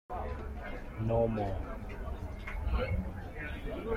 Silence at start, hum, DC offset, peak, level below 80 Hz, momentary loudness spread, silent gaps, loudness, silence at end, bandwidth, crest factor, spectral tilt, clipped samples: 0.1 s; none; under 0.1%; -18 dBFS; -40 dBFS; 11 LU; none; -37 LUFS; 0 s; 15 kHz; 16 dB; -8.5 dB/octave; under 0.1%